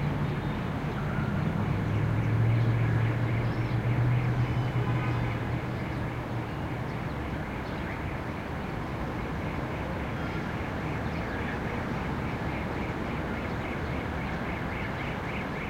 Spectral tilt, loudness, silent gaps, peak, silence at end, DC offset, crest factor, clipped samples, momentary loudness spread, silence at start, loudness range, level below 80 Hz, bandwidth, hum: -8 dB/octave; -31 LUFS; none; -16 dBFS; 0 s; under 0.1%; 14 dB; under 0.1%; 7 LU; 0 s; 6 LU; -42 dBFS; 9.2 kHz; none